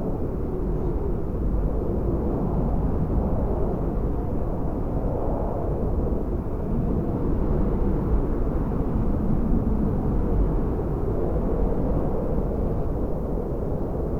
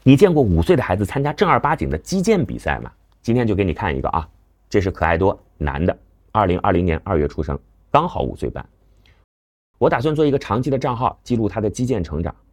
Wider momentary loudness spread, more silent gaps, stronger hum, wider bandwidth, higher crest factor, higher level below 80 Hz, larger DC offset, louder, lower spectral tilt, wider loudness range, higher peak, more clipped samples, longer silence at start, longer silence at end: second, 4 LU vs 10 LU; second, none vs 9.24-9.74 s; neither; second, 3 kHz vs 16.5 kHz; second, 14 dB vs 20 dB; first, -26 dBFS vs -36 dBFS; neither; second, -26 LUFS vs -20 LUFS; first, -11.5 dB/octave vs -7 dB/octave; about the same, 2 LU vs 3 LU; second, -10 dBFS vs 0 dBFS; neither; about the same, 0 s vs 0.05 s; second, 0 s vs 0.2 s